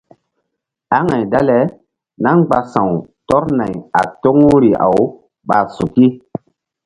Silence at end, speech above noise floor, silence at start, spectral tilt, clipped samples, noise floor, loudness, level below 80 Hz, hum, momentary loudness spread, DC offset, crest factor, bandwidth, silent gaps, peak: 0.7 s; 62 dB; 0.9 s; -8.5 dB/octave; under 0.1%; -75 dBFS; -14 LUFS; -46 dBFS; none; 10 LU; under 0.1%; 14 dB; 11 kHz; none; 0 dBFS